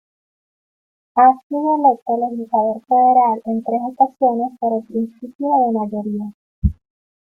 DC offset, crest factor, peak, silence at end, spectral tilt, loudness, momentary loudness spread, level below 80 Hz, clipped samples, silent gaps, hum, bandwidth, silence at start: under 0.1%; 16 dB; -2 dBFS; 0.55 s; -11 dB/octave; -18 LUFS; 11 LU; -36 dBFS; under 0.1%; 1.43-1.50 s, 2.02-2.06 s, 5.35-5.39 s, 6.34-6.62 s; none; 2.6 kHz; 1.15 s